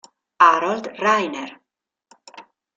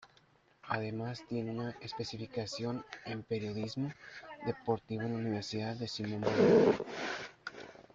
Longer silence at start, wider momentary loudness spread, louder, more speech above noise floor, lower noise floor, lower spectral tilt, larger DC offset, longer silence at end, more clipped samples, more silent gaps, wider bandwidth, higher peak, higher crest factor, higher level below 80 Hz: first, 0.4 s vs 0 s; about the same, 16 LU vs 15 LU; first, -18 LUFS vs -35 LUFS; first, 59 dB vs 33 dB; first, -81 dBFS vs -67 dBFS; second, -3.5 dB/octave vs -6 dB/octave; neither; first, 0.35 s vs 0.1 s; neither; neither; about the same, 7.8 kHz vs 7.8 kHz; first, -2 dBFS vs -16 dBFS; about the same, 20 dB vs 20 dB; about the same, -72 dBFS vs -68 dBFS